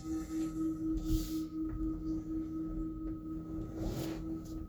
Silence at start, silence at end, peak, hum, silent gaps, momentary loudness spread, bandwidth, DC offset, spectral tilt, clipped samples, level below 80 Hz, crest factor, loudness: 0 s; 0 s; -20 dBFS; none; none; 6 LU; over 20 kHz; under 0.1%; -7 dB/octave; under 0.1%; -44 dBFS; 18 dB; -39 LUFS